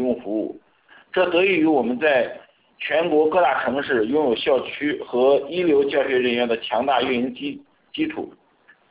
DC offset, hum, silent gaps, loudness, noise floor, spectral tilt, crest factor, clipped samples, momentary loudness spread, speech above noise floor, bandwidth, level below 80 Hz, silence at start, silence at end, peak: under 0.1%; none; none; -21 LUFS; -56 dBFS; -9 dB/octave; 14 dB; under 0.1%; 13 LU; 36 dB; 4 kHz; -60 dBFS; 0 s; 0.6 s; -6 dBFS